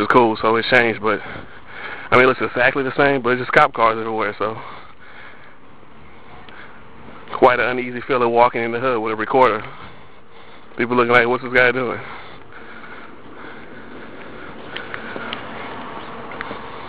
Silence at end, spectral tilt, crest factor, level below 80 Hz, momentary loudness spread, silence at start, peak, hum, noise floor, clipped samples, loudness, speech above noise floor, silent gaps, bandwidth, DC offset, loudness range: 0 s; -6.5 dB/octave; 20 dB; -52 dBFS; 24 LU; 0 s; 0 dBFS; none; -46 dBFS; under 0.1%; -17 LUFS; 29 dB; none; 9.2 kHz; 1%; 15 LU